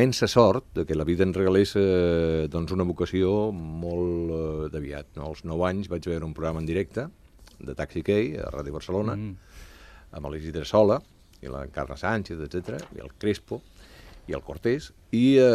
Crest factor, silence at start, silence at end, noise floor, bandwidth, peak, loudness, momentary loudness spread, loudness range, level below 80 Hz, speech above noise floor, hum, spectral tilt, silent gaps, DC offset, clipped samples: 22 dB; 0 s; 0 s; -49 dBFS; 14.5 kHz; -2 dBFS; -26 LUFS; 16 LU; 7 LU; -44 dBFS; 23 dB; none; -6.5 dB/octave; none; under 0.1%; under 0.1%